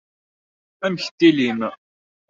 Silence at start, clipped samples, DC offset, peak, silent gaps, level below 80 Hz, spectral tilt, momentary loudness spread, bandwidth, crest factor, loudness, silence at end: 0.8 s; under 0.1%; under 0.1%; -2 dBFS; 1.11-1.18 s; -66 dBFS; -5.5 dB/octave; 11 LU; 7.6 kHz; 20 dB; -20 LUFS; 0.55 s